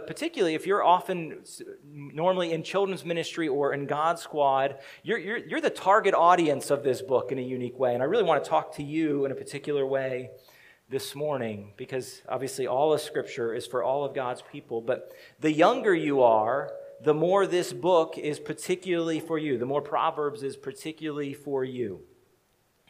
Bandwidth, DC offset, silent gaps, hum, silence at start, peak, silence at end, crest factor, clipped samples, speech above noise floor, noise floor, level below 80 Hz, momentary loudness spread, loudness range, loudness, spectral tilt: 15.5 kHz; under 0.1%; none; none; 0 s; -6 dBFS; 0.85 s; 20 dB; under 0.1%; 41 dB; -68 dBFS; -74 dBFS; 14 LU; 6 LU; -27 LUFS; -5 dB/octave